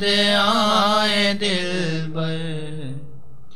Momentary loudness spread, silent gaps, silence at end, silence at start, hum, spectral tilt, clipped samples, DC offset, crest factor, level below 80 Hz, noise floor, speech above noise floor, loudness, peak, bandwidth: 16 LU; none; 0.15 s; 0 s; none; -4 dB/octave; under 0.1%; 4%; 16 dB; -56 dBFS; -45 dBFS; 25 dB; -19 LUFS; -6 dBFS; 14.5 kHz